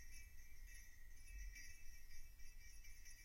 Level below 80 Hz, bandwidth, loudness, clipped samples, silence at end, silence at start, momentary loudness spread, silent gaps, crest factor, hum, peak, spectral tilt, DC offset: -58 dBFS; 16 kHz; -62 LUFS; under 0.1%; 0 s; 0 s; 6 LU; none; 12 dB; none; -42 dBFS; -1.5 dB/octave; under 0.1%